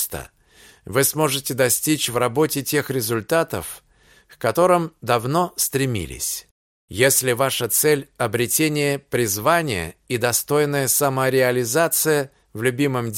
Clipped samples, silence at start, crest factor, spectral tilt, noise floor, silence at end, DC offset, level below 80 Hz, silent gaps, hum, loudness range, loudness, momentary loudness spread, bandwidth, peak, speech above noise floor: under 0.1%; 0 s; 18 dB; -3.5 dB/octave; -51 dBFS; 0 s; under 0.1%; -52 dBFS; 6.51-6.88 s; none; 2 LU; -20 LUFS; 8 LU; 17 kHz; -2 dBFS; 31 dB